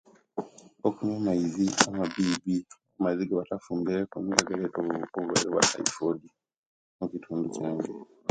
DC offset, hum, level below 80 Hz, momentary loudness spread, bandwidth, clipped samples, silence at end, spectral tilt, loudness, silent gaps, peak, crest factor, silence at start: under 0.1%; none; -64 dBFS; 13 LU; 10.5 kHz; under 0.1%; 0 s; -3.5 dB/octave; -29 LUFS; 6.58-6.99 s; 0 dBFS; 30 dB; 0.35 s